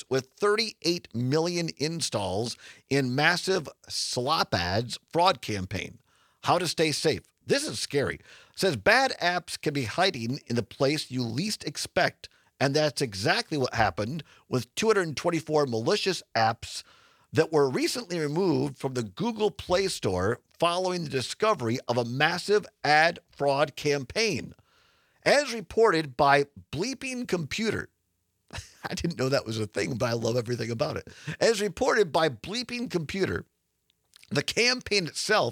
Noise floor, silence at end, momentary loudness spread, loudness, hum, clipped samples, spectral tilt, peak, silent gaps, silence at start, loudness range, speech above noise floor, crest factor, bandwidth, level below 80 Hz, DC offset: -76 dBFS; 0 s; 9 LU; -27 LUFS; none; under 0.1%; -4 dB/octave; -4 dBFS; none; 0.1 s; 3 LU; 49 dB; 22 dB; 17 kHz; -60 dBFS; under 0.1%